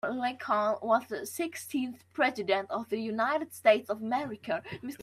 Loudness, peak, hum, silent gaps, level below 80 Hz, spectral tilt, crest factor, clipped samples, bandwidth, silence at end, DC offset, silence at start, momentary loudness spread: -31 LUFS; -10 dBFS; none; none; -76 dBFS; -4 dB/octave; 20 dB; under 0.1%; 15.5 kHz; 0 s; under 0.1%; 0.05 s; 9 LU